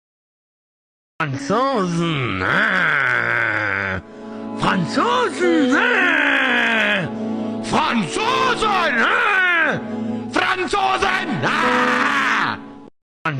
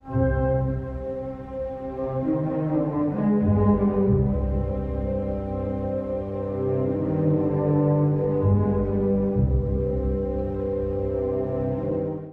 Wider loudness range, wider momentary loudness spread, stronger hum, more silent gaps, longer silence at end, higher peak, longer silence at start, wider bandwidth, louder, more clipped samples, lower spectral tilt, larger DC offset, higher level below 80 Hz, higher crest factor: about the same, 2 LU vs 3 LU; about the same, 10 LU vs 8 LU; neither; first, 13.02-13.25 s vs none; about the same, 0 s vs 0 s; about the same, -6 dBFS vs -8 dBFS; first, 1.2 s vs 0.05 s; first, 15 kHz vs 3.7 kHz; first, -18 LUFS vs -25 LUFS; neither; second, -4.5 dB/octave vs -12.5 dB/octave; neither; second, -52 dBFS vs -34 dBFS; about the same, 12 dB vs 14 dB